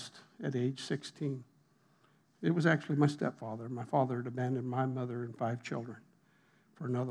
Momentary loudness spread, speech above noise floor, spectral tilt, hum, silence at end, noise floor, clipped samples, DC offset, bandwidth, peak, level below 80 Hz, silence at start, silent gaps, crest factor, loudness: 12 LU; 35 dB; -7 dB/octave; none; 0 s; -69 dBFS; under 0.1%; under 0.1%; 11 kHz; -14 dBFS; under -90 dBFS; 0 s; none; 22 dB; -35 LUFS